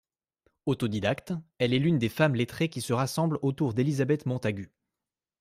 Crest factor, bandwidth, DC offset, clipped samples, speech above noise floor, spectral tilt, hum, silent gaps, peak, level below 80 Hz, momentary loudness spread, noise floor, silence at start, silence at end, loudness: 18 dB; 15.5 kHz; under 0.1%; under 0.1%; over 63 dB; -6.5 dB/octave; none; none; -12 dBFS; -62 dBFS; 8 LU; under -90 dBFS; 0.65 s; 0.75 s; -28 LUFS